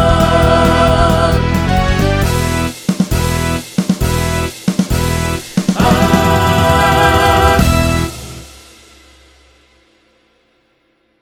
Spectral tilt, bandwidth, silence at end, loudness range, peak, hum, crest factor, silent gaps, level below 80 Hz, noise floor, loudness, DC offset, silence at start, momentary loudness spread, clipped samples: -5.5 dB/octave; over 20 kHz; 2.7 s; 5 LU; 0 dBFS; none; 14 dB; none; -22 dBFS; -58 dBFS; -13 LUFS; under 0.1%; 0 s; 8 LU; under 0.1%